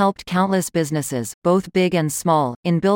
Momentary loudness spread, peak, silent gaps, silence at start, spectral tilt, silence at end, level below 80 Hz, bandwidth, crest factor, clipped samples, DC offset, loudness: 4 LU; -6 dBFS; 1.34-1.42 s, 2.56-2.63 s; 0 s; -5.5 dB/octave; 0 s; -54 dBFS; 17 kHz; 14 dB; under 0.1%; under 0.1%; -20 LUFS